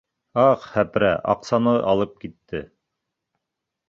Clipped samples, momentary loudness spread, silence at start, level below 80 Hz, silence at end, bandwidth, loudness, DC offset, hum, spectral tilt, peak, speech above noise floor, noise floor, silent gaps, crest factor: under 0.1%; 15 LU; 0.35 s; -54 dBFS; 1.25 s; 7.6 kHz; -21 LUFS; under 0.1%; none; -7 dB/octave; -4 dBFS; 62 dB; -83 dBFS; none; 18 dB